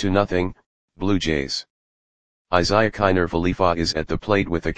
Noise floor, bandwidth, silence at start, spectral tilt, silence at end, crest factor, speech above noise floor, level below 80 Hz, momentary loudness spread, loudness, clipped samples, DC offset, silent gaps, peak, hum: under -90 dBFS; 9.8 kHz; 0 s; -5.5 dB/octave; 0 s; 20 dB; over 69 dB; -40 dBFS; 8 LU; -21 LUFS; under 0.1%; 2%; 0.66-0.88 s, 1.70-2.45 s; 0 dBFS; none